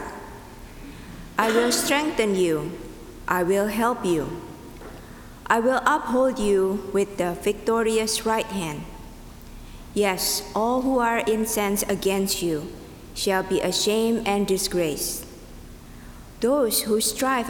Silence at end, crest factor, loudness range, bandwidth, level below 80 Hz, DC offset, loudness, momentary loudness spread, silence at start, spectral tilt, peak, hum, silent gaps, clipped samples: 0 s; 22 dB; 2 LU; over 20 kHz; -46 dBFS; under 0.1%; -23 LUFS; 21 LU; 0 s; -3.5 dB/octave; -2 dBFS; none; none; under 0.1%